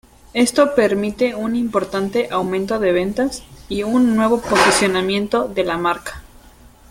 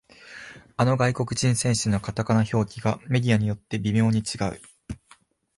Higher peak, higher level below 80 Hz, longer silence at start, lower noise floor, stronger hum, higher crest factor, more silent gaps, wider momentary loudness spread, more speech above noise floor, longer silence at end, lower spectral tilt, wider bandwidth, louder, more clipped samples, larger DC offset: first, -2 dBFS vs -10 dBFS; about the same, -46 dBFS vs -50 dBFS; about the same, 0.35 s vs 0.25 s; second, -45 dBFS vs -58 dBFS; neither; about the same, 18 dB vs 16 dB; neither; second, 9 LU vs 19 LU; second, 28 dB vs 35 dB; about the same, 0.7 s vs 0.65 s; second, -4 dB/octave vs -5.5 dB/octave; first, 16.5 kHz vs 11.5 kHz; first, -18 LUFS vs -24 LUFS; neither; neither